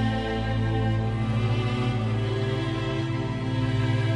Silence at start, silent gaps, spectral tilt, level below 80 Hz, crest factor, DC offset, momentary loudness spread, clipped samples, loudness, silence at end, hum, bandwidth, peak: 0 s; none; -7.5 dB/octave; -40 dBFS; 10 dB; under 0.1%; 3 LU; under 0.1%; -26 LUFS; 0 s; none; 9.4 kHz; -14 dBFS